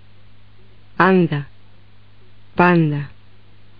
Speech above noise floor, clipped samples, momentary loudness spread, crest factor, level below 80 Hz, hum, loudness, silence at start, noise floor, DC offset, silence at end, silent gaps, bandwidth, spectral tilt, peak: 35 dB; under 0.1%; 22 LU; 20 dB; -54 dBFS; 50 Hz at -50 dBFS; -17 LUFS; 1 s; -50 dBFS; 1%; 0.7 s; none; 5.2 kHz; -6 dB/octave; 0 dBFS